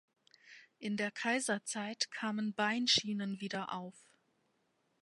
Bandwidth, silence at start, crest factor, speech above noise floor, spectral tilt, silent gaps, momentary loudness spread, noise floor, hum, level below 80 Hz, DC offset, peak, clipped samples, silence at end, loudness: 11.5 kHz; 0.45 s; 22 dB; 42 dB; -3 dB/octave; none; 12 LU; -78 dBFS; none; -80 dBFS; under 0.1%; -16 dBFS; under 0.1%; 1.05 s; -35 LUFS